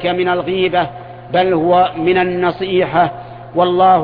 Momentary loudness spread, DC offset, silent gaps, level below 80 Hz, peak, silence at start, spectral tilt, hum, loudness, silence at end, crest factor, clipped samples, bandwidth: 8 LU; under 0.1%; none; -48 dBFS; -2 dBFS; 0 s; -9.5 dB/octave; none; -15 LUFS; 0 s; 12 dB; under 0.1%; 5 kHz